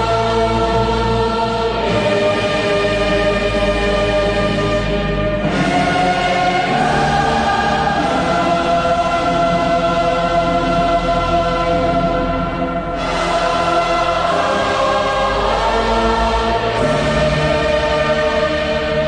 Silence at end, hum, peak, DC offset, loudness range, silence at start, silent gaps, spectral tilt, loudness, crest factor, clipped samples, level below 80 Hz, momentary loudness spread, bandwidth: 0 s; none; -4 dBFS; under 0.1%; 1 LU; 0 s; none; -5.5 dB/octave; -16 LUFS; 12 dB; under 0.1%; -28 dBFS; 2 LU; 10 kHz